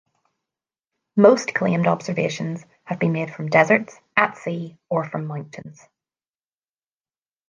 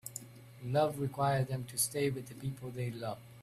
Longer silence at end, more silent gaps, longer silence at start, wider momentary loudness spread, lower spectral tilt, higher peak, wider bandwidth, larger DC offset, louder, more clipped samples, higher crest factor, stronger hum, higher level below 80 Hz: first, 1.75 s vs 0 s; neither; first, 1.15 s vs 0.05 s; first, 16 LU vs 13 LU; first, -6.5 dB/octave vs -5 dB/octave; first, -2 dBFS vs -18 dBFS; second, 9.2 kHz vs 15.5 kHz; neither; first, -21 LUFS vs -35 LUFS; neither; about the same, 22 dB vs 18 dB; neither; about the same, -68 dBFS vs -68 dBFS